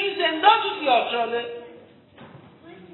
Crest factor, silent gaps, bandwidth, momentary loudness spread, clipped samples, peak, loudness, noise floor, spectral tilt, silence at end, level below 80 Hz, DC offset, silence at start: 22 dB; none; 4.2 kHz; 15 LU; under 0.1%; -2 dBFS; -21 LUFS; -48 dBFS; -7.5 dB/octave; 0.1 s; -76 dBFS; under 0.1%; 0 s